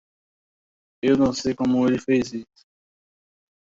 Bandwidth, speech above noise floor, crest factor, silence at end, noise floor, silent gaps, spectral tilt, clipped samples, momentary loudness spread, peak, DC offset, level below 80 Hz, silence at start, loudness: 7.8 kHz; over 69 dB; 18 dB; 1.25 s; under -90 dBFS; none; -6 dB/octave; under 0.1%; 9 LU; -8 dBFS; under 0.1%; -56 dBFS; 1.05 s; -22 LUFS